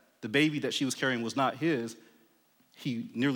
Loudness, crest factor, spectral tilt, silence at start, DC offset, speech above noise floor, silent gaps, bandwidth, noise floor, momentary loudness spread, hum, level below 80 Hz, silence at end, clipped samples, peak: -30 LUFS; 18 dB; -4.5 dB/octave; 0.2 s; under 0.1%; 37 dB; none; 18.5 kHz; -67 dBFS; 9 LU; none; -84 dBFS; 0 s; under 0.1%; -14 dBFS